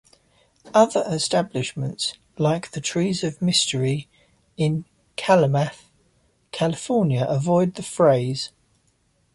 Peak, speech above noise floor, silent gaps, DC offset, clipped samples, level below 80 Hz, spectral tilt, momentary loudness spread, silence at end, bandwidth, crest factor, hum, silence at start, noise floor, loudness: -4 dBFS; 44 dB; none; under 0.1%; under 0.1%; -58 dBFS; -5 dB/octave; 10 LU; 0.9 s; 11.5 kHz; 20 dB; none; 0.65 s; -65 dBFS; -22 LUFS